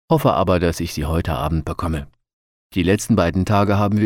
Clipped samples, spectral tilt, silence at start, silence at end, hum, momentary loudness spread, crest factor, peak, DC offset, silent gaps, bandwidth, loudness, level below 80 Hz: under 0.1%; -6.5 dB/octave; 0.1 s; 0 s; none; 8 LU; 16 dB; -4 dBFS; under 0.1%; 2.33-2.70 s; 17 kHz; -19 LUFS; -34 dBFS